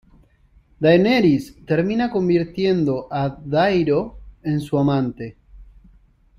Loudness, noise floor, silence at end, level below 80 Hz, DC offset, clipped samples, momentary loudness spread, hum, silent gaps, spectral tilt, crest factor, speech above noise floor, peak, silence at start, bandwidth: -19 LUFS; -55 dBFS; 0.75 s; -48 dBFS; under 0.1%; under 0.1%; 10 LU; none; none; -8 dB/octave; 18 dB; 36 dB; -2 dBFS; 0.8 s; 14.5 kHz